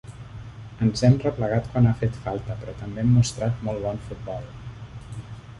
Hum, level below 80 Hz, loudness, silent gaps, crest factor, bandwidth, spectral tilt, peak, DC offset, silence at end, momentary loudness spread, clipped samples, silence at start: none; -44 dBFS; -24 LUFS; none; 20 dB; 11 kHz; -7 dB/octave; -6 dBFS; under 0.1%; 0 s; 20 LU; under 0.1%; 0.05 s